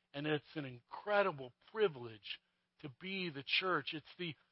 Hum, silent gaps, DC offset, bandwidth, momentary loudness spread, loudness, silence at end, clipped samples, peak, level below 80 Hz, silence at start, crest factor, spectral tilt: none; none; under 0.1%; 5.6 kHz; 14 LU; -39 LUFS; 0.2 s; under 0.1%; -20 dBFS; -84 dBFS; 0.15 s; 20 dB; -2.5 dB/octave